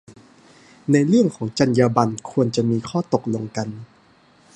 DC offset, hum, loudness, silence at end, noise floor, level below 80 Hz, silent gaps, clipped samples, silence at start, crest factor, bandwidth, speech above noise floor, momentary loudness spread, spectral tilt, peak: under 0.1%; none; -20 LUFS; 0.7 s; -54 dBFS; -58 dBFS; none; under 0.1%; 0.1 s; 20 dB; 10 kHz; 35 dB; 12 LU; -6.5 dB/octave; -2 dBFS